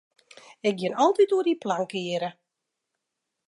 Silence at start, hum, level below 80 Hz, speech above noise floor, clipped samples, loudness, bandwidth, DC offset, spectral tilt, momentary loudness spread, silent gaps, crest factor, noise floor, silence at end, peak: 0.65 s; none; -82 dBFS; 59 dB; under 0.1%; -25 LUFS; 11 kHz; under 0.1%; -5.5 dB/octave; 9 LU; none; 18 dB; -83 dBFS; 1.15 s; -8 dBFS